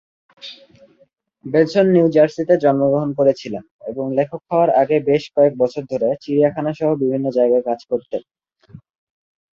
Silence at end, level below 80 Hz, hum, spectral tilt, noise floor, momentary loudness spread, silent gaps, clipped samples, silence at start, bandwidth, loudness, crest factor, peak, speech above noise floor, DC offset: 0.75 s; -60 dBFS; none; -8 dB/octave; -58 dBFS; 15 LU; 3.71-3.79 s; under 0.1%; 0.45 s; 7.4 kHz; -17 LUFS; 16 dB; -2 dBFS; 41 dB; under 0.1%